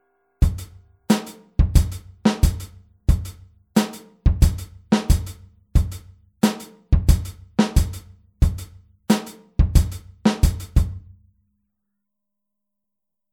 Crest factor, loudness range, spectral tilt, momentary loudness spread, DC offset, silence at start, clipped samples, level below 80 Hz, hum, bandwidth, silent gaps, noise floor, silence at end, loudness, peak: 20 dB; 2 LU; -6 dB/octave; 16 LU; under 0.1%; 0.4 s; under 0.1%; -24 dBFS; none; 18 kHz; none; -85 dBFS; 2.35 s; -22 LUFS; -2 dBFS